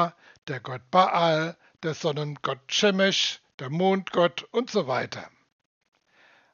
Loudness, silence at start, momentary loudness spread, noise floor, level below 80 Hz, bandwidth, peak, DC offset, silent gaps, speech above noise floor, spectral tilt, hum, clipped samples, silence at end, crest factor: -25 LUFS; 0 s; 14 LU; -60 dBFS; -78 dBFS; 7.2 kHz; -6 dBFS; under 0.1%; 0.38-0.42 s, 3.54-3.58 s; 35 dB; -3 dB/octave; none; under 0.1%; 1.25 s; 20 dB